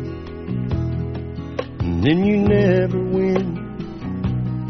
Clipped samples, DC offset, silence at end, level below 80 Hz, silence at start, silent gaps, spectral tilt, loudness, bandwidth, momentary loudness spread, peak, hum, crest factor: under 0.1%; under 0.1%; 0 s; -38 dBFS; 0 s; none; -7.5 dB/octave; -21 LUFS; 6.2 kHz; 13 LU; -4 dBFS; none; 18 dB